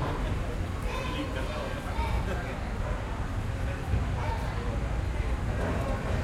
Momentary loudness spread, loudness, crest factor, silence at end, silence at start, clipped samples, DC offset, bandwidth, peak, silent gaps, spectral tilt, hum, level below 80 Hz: 3 LU; -32 LUFS; 14 dB; 0 s; 0 s; under 0.1%; under 0.1%; 14 kHz; -16 dBFS; none; -6.5 dB/octave; none; -34 dBFS